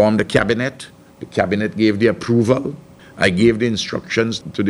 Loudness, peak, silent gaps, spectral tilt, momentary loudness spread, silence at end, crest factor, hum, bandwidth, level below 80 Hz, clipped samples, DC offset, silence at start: -18 LUFS; 0 dBFS; none; -6 dB/octave; 14 LU; 0 s; 18 dB; none; 11.5 kHz; -46 dBFS; under 0.1%; under 0.1%; 0 s